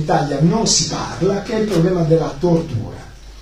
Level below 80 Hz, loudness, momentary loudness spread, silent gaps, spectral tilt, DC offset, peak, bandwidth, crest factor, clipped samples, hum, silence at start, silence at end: -36 dBFS; -17 LUFS; 11 LU; none; -5 dB/octave; under 0.1%; -2 dBFS; 12 kHz; 16 dB; under 0.1%; none; 0 s; 0 s